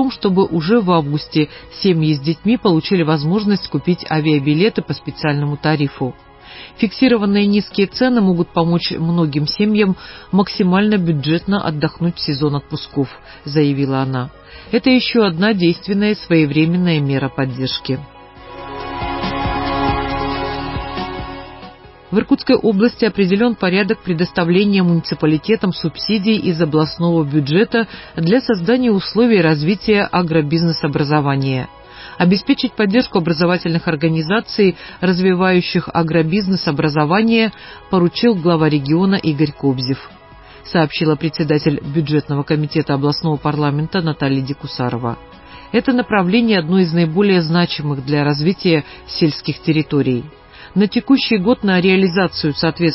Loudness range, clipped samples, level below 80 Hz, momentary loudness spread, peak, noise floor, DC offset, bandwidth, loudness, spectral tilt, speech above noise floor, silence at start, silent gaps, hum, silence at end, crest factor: 4 LU; under 0.1%; -42 dBFS; 9 LU; 0 dBFS; -40 dBFS; under 0.1%; 5.8 kHz; -16 LUFS; -10.5 dB/octave; 25 dB; 0 s; none; none; 0 s; 16 dB